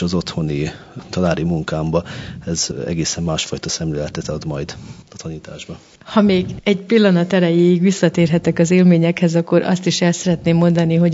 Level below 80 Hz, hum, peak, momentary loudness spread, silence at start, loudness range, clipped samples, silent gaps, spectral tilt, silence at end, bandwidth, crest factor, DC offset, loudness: -44 dBFS; none; 0 dBFS; 17 LU; 0 s; 8 LU; under 0.1%; none; -6 dB/octave; 0 s; 8 kHz; 16 dB; under 0.1%; -17 LUFS